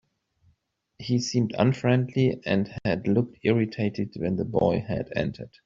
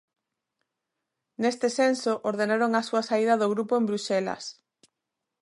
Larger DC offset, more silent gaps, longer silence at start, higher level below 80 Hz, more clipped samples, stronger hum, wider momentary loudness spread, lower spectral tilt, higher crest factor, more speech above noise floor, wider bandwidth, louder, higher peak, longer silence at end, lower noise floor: neither; neither; second, 1 s vs 1.4 s; first, -56 dBFS vs -78 dBFS; neither; neither; about the same, 6 LU vs 5 LU; first, -6.5 dB/octave vs -4.5 dB/octave; about the same, 20 dB vs 16 dB; second, 45 dB vs 60 dB; second, 7.6 kHz vs 11.5 kHz; about the same, -26 LUFS vs -26 LUFS; first, -6 dBFS vs -10 dBFS; second, 0.2 s vs 0.9 s; second, -70 dBFS vs -85 dBFS